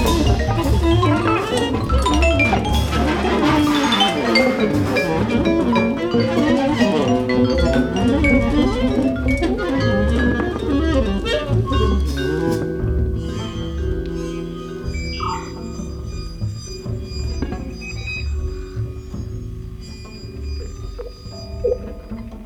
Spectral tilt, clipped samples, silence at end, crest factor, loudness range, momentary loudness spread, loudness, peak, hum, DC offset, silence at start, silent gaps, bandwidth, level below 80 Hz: -6 dB/octave; under 0.1%; 0 s; 16 dB; 12 LU; 14 LU; -19 LUFS; -2 dBFS; none; under 0.1%; 0 s; none; 16.5 kHz; -26 dBFS